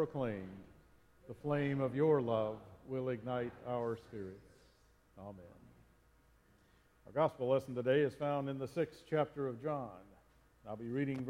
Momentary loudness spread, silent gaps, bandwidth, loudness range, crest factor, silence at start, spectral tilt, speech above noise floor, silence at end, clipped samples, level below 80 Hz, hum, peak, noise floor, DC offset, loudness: 20 LU; none; 14.5 kHz; 10 LU; 20 dB; 0 s; -8 dB/octave; 31 dB; 0 s; under 0.1%; -70 dBFS; none; -20 dBFS; -69 dBFS; under 0.1%; -38 LUFS